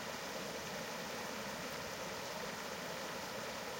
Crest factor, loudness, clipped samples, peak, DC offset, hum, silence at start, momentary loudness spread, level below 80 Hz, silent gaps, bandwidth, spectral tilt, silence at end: 14 dB; -43 LUFS; under 0.1%; -30 dBFS; under 0.1%; none; 0 s; 0 LU; -70 dBFS; none; 16.5 kHz; -2.5 dB/octave; 0 s